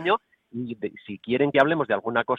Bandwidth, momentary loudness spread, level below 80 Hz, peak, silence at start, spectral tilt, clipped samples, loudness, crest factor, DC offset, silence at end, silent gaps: 7.2 kHz; 15 LU; -66 dBFS; -6 dBFS; 0 s; -7.5 dB/octave; under 0.1%; -24 LUFS; 20 dB; under 0.1%; 0 s; none